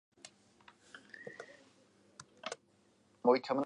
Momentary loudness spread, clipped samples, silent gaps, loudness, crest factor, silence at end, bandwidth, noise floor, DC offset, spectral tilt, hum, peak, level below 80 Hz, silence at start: 26 LU; under 0.1%; none; -36 LUFS; 24 dB; 0 s; 10.5 kHz; -70 dBFS; under 0.1%; -4.5 dB/octave; none; -16 dBFS; -88 dBFS; 1.2 s